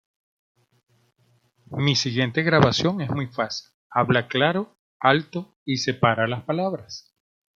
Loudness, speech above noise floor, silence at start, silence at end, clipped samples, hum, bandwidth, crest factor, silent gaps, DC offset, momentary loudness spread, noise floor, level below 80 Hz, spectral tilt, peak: -23 LUFS; 42 dB; 1.7 s; 0.6 s; under 0.1%; none; 7.6 kHz; 22 dB; 3.74-3.90 s, 4.79-5.00 s, 5.56-5.66 s; under 0.1%; 15 LU; -64 dBFS; -60 dBFS; -5 dB/octave; -2 dBFS